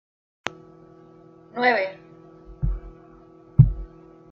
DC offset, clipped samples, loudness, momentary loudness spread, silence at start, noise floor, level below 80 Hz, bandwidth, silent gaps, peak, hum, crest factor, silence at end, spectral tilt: under 0.1%; under 0.1%; -23 LUFS; 19 LU; 0.45 s; -50 dBFS; -36 dBFS; 7.4 kHz; none; -2 dBFS; none; 24 dB; 0.45 s; -7.5 dB/octave